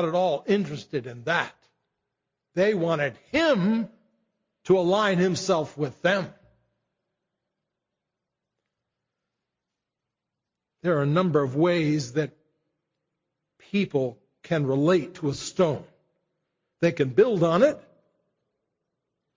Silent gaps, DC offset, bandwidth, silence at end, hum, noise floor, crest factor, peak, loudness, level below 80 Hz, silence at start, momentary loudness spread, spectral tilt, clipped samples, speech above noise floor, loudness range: none; under 0.1%; 7.6 kHz; 1.6 s; none; -86 dBFS; 18 dB; -8 dBFS; -25 LUFS; -64 dBFS; 0 s; 10 LU; -6 dB/octave; under 0.1%; 62 dB; 5 LU